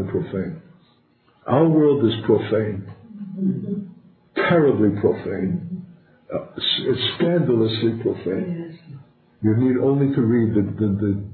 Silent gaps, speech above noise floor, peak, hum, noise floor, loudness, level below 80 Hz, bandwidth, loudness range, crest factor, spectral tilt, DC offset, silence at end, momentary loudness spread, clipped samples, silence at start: none; 39 dB; -4 dBFS; none; -59 dBFS; -21 LUFS; -50 dBFS; 4.5 kHz; 1 LU; 18 dB; -12 dB/octave; under 0.1%; 0 s; 16 LU; under 0.1%; 0 s